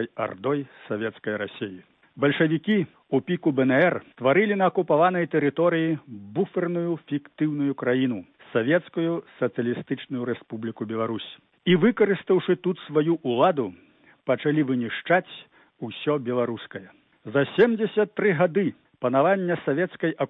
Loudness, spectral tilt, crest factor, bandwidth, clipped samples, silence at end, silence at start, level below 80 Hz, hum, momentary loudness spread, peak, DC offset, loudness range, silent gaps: -24 LUFS; -10 dB/octave; 16 dB; 4.1 kHz; under 0.1%; 0 s; 0 s; -70 dBFS; none; 12 LU; -8 dBFS; under 0.1%; 5 LU; none